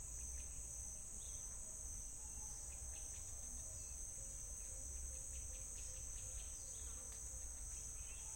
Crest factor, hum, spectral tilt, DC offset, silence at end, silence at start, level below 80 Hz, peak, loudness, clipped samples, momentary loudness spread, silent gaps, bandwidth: 14 dB; none; -2 dB/octave; under 0.1%; 0 s; 0 s; -56 dBFS; -36 dBFS; -49 LUFS; under 0.1%; 1 LU; none; 16.5 kHz